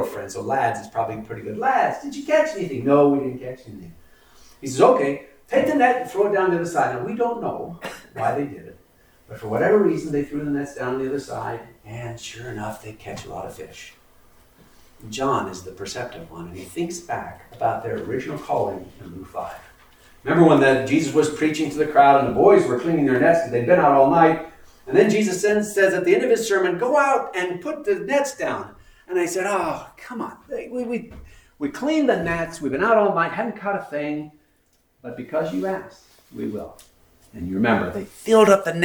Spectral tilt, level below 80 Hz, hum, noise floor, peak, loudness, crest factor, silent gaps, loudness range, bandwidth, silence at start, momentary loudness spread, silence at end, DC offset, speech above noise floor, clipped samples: -5.5 dB/octave; -54 dBFS; none; -63 dBFS; -2 dBFS; -21 LUFS; 20 dB; none; 13 LU; over 20 kHz; 0 s; 19 LU; 0 s; under 0.1%; 42 dB; under 0.1%